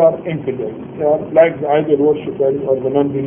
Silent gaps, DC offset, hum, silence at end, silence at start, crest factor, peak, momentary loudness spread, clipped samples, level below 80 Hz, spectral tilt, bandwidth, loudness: none; under 0.1%; none; 0 s; 0 s; 14 dB; 0 dBFS; 9 LU; under 0.1%; -54 dBFS; -11.5 dB/octave; 3.5 kHz; -16 LUFS